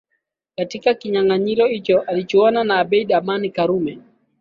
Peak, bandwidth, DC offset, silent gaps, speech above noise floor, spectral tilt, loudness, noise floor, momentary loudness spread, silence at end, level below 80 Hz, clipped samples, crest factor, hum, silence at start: -2 dBFS; 7.2 kHz; under 0.1%; none; 55 dB; -6.5 dB/octave; -18 LUFS; -73 dBFS; 9 LU; 0.4 s; -62 dBFS; under 0.1%; 16 dB; none; 0.6 s